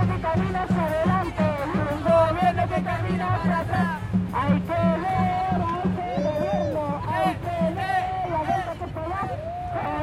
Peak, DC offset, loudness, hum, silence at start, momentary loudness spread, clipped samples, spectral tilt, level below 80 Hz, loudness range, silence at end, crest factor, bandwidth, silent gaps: -8 dBFS; under 0.1%; -24 LUFS; none; 0 s; 6 LU; under 0.1%; -8 dB/octave; -42 dBFS; 3 LU; 0 s; 16 dB; 13 kHz; none